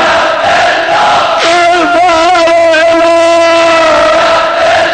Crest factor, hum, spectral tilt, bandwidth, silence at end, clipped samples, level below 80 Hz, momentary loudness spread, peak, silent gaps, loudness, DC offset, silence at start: 6 dB; none; -2.5 dB/octave; 9.6 kHz; 0 s; under 0.1%; -40 dBFS; 2 LU; 0 dBFS; none; -6 LUFS; 0.5%; 0 s